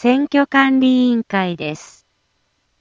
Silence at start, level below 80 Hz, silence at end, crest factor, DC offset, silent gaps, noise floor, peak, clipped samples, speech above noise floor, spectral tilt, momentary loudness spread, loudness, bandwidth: 0 s; -62 dBFS; 1 s; 16 dB; under 0.1%; none; -66 dBFS; -2 dBFS; under 0.1%; 50 dB; -6 dB/octave; 13 LU; -16 LUFS; 7.6 kHz